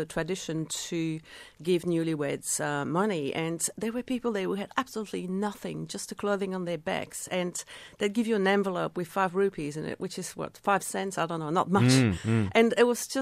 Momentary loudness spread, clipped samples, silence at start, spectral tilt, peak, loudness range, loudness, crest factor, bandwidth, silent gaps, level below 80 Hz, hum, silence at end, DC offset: 11 LU; under 0.1%; 0 s; -5 dB/octave; -8 dBFS; 5 LU; -29 LUFS; 20 dB; 16 kHz; none; -62 dBFS; none; 0 s; under 0.1%